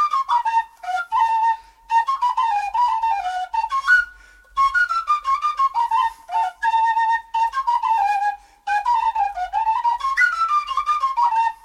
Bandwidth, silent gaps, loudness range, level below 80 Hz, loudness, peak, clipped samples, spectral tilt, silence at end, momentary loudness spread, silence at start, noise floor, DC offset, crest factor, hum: 12 kHz; none; 1 LU; -54 dBFS; -20 LUFS; -6 dBFS; under 0.1%; 0.5 dB/octave; 0.1 s; 6 LU; 0 s; -46 dBFS; under 0.1%; 14 dB; none